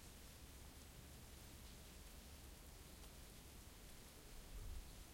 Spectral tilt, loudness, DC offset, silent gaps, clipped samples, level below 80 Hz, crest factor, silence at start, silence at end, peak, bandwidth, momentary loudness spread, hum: -3.5 dB/octave; -59 LUFS; under 0.1%; none; under 0.1%; -60 dBFS; 16 dB; 0 s; 0 s; -42 dBFS; 16.5 kHz; 3 LU; none